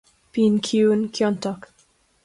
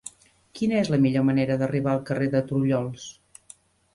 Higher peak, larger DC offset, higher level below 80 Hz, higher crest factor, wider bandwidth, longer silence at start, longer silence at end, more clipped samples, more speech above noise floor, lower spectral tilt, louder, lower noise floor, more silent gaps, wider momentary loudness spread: about the same, -8 dBFS vs -10 dBFS; neither; second, -64 dBFS vs -58 dBFS; about the same, 14 dB vs 16 dB; about the same, 11.5 kHz vs 11.5 kHz; first, 0.35 s vs 0.05 s; second, 0.65 s vs 0.85 s; neither; first, 41 dB vs 30 dB; second, -5.5 dB/octave vs -7 dB/octave; first, -21 LUFS vs -24 LUFS; first, -61 dBFS vs -53 dBFS; neither; second, 11 LU vs 14 LU